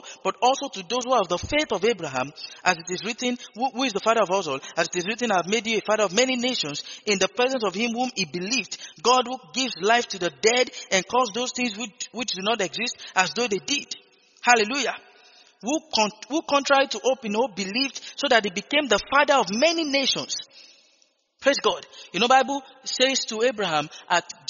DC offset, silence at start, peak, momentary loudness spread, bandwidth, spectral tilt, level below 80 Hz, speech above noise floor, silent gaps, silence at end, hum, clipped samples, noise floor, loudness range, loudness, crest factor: under 0.1%; 0.05 s; -2 dBFS; 9 LU; 7.4 kHz; -1 dB/octave; -60 dBFS; 40 dB; none; 0.2 s; none; under 0.1%; -64 dBFS; 3 LU; -23 LUFS; 22 dB